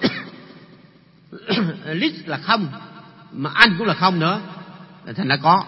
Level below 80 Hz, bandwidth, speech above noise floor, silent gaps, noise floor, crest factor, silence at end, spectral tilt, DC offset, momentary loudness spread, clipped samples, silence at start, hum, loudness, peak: -58 dBFS; 11 kHz; 31 dB; none; -50 dBFS; 22 dB; 0 s; -6.5 dB/octave; under 0.1%; 24 LU; under 0.1%; 0 s; none; -19 LUFS; 0 dBFS